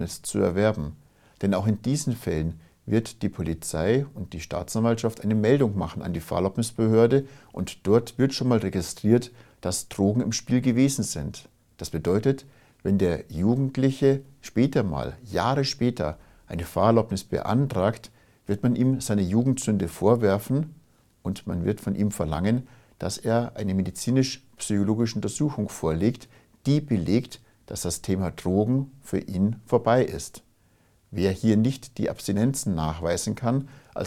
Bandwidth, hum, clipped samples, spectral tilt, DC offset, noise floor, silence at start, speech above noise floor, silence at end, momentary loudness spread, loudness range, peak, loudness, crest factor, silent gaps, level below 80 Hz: 16 kHz; none; under 0.1%; -6 dB/octave; under 0.1%; -62 dBFS; 0 s; 37 dB; 0 s; 11 LU; 3 LU; -4 dBFS; -25 LUFS; 20 dB; none; -50 dBFS